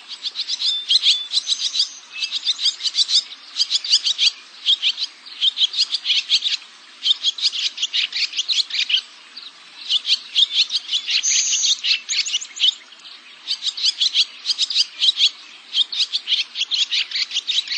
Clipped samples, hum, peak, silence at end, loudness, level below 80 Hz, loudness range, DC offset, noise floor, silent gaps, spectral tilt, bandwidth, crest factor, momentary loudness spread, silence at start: under 0.1%; none; -2 dBFS; 0 s; -18 LUFS; under -90 dBFS; 2 LU; under 0.1%; -42 dBFS; none; 6.5 dB/octave; 9 kHz; 18 dB; 10 LU; 0 s